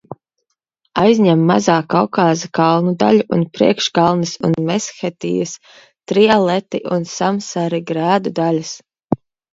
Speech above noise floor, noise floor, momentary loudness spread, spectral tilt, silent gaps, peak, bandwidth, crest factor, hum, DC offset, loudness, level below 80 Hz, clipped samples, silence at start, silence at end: 57 dB; -73 dBFS; 12 LU; -5.5 dB/octave; none; 0 dBFS; 7.8 kHz; 16 dB; none; under 0.1%; -16 LUFS; -56 dBFS; under 0.1%; 0.1 s; 0.4 s